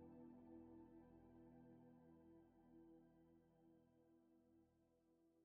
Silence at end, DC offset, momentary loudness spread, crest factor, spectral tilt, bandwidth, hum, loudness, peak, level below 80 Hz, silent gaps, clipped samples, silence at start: 0 s; under 0.1%; 6 LU; 16 dB; -7 dB/octave; 3.1 kHz; none; -67 LUFS; -52 dBFS; -86 dBFS; none; under 0.1%; 0 s